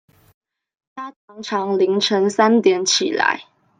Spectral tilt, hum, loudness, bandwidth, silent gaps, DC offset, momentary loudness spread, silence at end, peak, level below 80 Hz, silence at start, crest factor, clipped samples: -3 dB/octave; none; -17 LUFS; 9.6 kHz; 1.16-1.28 s; under 0.1%; 19 LU; 0.35 s; -2 dBFS; -72 dBFS; 0.95 s; 18 dB; under 0.1%